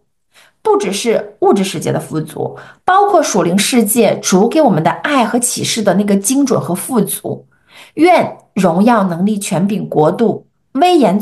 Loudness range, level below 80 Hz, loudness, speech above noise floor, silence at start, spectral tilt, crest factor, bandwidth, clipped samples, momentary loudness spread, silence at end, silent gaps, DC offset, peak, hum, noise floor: 2 LU; -58 dBFS; -13 LUFS; 37 dB; 0.65 s; -4.5 dB/octave; 12 dB; 13 kHz; under 0.1%; 11 LU; 0 s; none; 0.1%; 0 dBFS; none; -50 dBFS